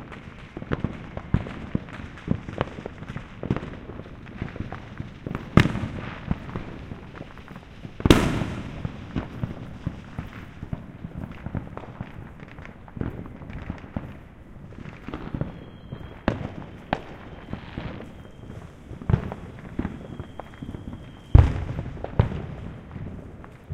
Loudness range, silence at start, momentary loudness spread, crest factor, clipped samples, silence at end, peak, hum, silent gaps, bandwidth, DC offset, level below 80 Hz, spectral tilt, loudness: 11 LU; 0 s; 18 LU; 28 dB; under 0.1%; 0 s; 0 dBFS; none; none; 16 kHz; under 0.1%; -36 dBFS; -7 dB/octave; -29 LUFS